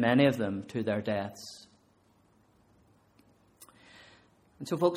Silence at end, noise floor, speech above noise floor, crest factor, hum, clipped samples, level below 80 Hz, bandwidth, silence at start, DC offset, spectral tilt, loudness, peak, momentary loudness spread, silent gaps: 0 s; -66 dBFS; 37 dB; 22 dB; none; under 0.1%; -70 dBFS; 16 kHz; 0 s; under 0.1%; -6.5 dB/octave; -30 LUFS; -10 dBFS; 29 LU; none